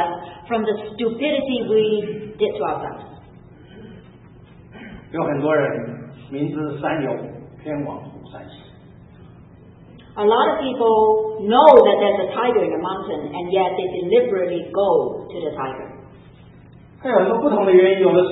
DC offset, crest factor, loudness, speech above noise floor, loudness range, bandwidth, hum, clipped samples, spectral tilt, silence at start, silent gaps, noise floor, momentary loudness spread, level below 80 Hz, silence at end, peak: under 0.1%; 20 dB; -19 LUFS; 27 dB; 12 LU; 4.1 kHz; none; under 0.1%; -9 dB/octave; 0 s; none; -45 dBFS; 21 LU; -54 dBFS; 0 s; 0 dBFS